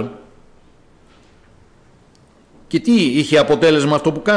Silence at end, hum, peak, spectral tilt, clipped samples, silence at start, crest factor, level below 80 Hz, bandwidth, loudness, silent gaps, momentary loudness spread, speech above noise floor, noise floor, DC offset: 0 s; none; -4 dBFS; -5.5 dB/octave; under 0.1%; 0 s; 14 dB; -52 dBFS; 10.5 kHz; -15 LUFS; none; 9 LU; 36 dB; -50 dBFS; under 0.1%